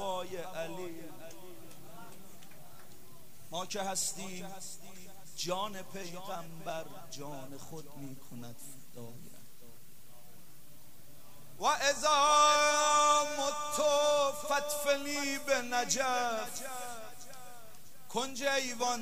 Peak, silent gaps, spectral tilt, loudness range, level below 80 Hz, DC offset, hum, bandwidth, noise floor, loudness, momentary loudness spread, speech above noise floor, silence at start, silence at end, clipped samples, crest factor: -14 dBFS; none; -1.5 dB/octave; 21 LU; -68 dBFS; 0.8%; none; 16 kHz; -59 dBFS; -31 LUFS; 25 LU; 26 dB; 0 s; 0 s; under 0.1%; 20 dB